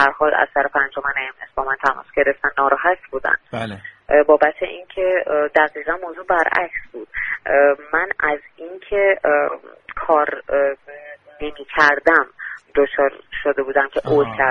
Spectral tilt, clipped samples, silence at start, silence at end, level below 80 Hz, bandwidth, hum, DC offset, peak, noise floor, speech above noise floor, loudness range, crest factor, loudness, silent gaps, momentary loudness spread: -5.5 dB/octave; under 0.1%; 0 s; 0 s; -48 dBFS; 6.8 kHz; none; under 0.1%; 0 dBFS; -39 dBFS; 21 dB; 2 LU; 18 dB; -18 LUFS; none; 15 LU